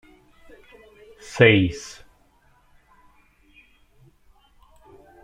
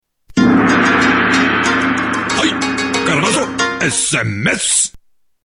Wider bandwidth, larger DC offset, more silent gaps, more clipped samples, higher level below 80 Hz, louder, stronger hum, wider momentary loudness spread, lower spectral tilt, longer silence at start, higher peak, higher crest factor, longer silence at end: about the same, 11.5 kHz vs 11 kHz; neither; neither; neither; second, -54 dBFS vs -44 dBFS; second, -17 LUFS vs -14 LUFS; neither; first, 30 LU vs 5 LU; first, -6 dB/octave vs -3 dB/octave; first, 1.3 s vs 0.3 s; about the same, -2 dBFS vs 0 dBFS; first, 24 dB vs 14 dB; first, 3.35 s vs 0.45 s